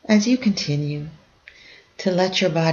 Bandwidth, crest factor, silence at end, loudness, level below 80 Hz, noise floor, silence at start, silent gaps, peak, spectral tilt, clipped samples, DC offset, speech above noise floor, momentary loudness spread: 7.4 kHz; 16 dB; 0 s; -21 LUFS; -58 dBFS; -49 dBFS; 0.1 s; none; -4 dBFS; -5.5 dB/octave; under 0.1%; under 0.1%; 29 dB; 12 LU